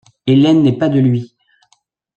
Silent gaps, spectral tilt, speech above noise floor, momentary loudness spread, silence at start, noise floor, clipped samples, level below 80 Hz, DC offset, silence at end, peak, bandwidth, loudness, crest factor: none; -8.5 dB/octave; 48 dB; 6 LU; 0.25 s; -60 dBFS; under 0.1%; -56 dBFS; under 0.1%; 0.9 s; -2 dBFS; 8 kHz; -13 LUFS; 12 dB